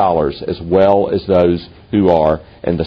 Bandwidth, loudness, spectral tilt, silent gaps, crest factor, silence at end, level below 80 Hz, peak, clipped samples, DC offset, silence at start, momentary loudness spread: 6 kHz; -15 LUFS; -9.5 dB/octave; none; 14 dB; 0 s; -38 dBFS; 0 dBFS; under 0.1%; under 0.1%; 0 s; 9 LU